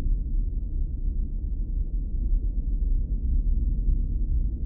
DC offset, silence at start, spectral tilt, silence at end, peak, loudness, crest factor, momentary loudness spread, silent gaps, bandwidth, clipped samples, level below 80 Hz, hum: under 0.1%; 0 s; -15 dB/octave; 0 s; -14 dBFS; -30 LUFS; 10 dB; 4 LU; none; 0.7 kHz; under 0.1%; -24 dBFS; none